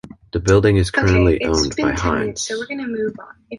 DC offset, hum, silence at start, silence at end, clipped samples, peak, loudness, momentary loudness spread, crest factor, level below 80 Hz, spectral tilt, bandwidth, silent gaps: under 0.1%; none; 0.05 s; 0 s; under 0.1%; -2 dBFS; -18 LUFS; 11 LU; 16 dB; -30 dBFS; -5.5 dB/octave; 11.5 kHz; none